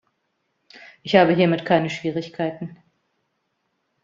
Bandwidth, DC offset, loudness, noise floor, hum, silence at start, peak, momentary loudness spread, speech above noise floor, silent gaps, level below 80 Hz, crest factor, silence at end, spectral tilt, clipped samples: 7.6 kHz; under 0.1%; -20 LUFS; -73 dBFS; none; 1.05 s; -2 dBFS; 20 LU; 53 dB; none; -62 dBFS; 22 dB; 1.3 s; -7 dB/octave; under 0.1%